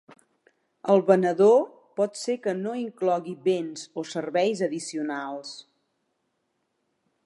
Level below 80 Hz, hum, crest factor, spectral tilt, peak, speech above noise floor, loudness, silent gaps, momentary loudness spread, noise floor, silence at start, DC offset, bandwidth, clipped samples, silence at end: -82 dBFS; none; 22 dB; -5.5 dB/octave; -6 dBFS; 52 dB; -25 LUFS; none; 16 LU; -76 dBFS; 0.85 s; under 0.1%; 11.5 kHz; under 0.1%; 1.65 s